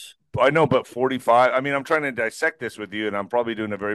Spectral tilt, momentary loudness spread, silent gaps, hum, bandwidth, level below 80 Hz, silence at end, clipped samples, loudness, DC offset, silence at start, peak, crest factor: -5.5 dB/octave; 10 LU; none; none; 12.5 kHz; -60 dBFS; 0 s; under 0.1%; -22 LUFS; under 0.1%; 0 s; -4 dBFS; 18 dB